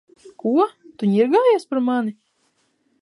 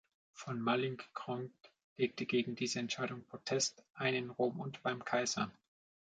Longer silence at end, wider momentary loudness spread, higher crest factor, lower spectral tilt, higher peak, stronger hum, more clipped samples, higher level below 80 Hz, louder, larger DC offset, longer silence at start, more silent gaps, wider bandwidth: first, 0.9 s vs 0.55 s; about the same, 9 LU vs 9 LU; about the same, 16 dB vs 20 dB; first, -7.5 dB/octave vs -4 dB/octave; first, -6 dBFS vs -20 dBFS; neither; neither; about the same, -78 dBFS vs -80 dBFS; first, -20 LUFS vs -38 LUFS; neither; about the same, 0.25 s vs 0.35 s; second, none vs 1.84-1.96 s, 3.90-3.94 s; first, 11.5 kHz vs 9.4 kHz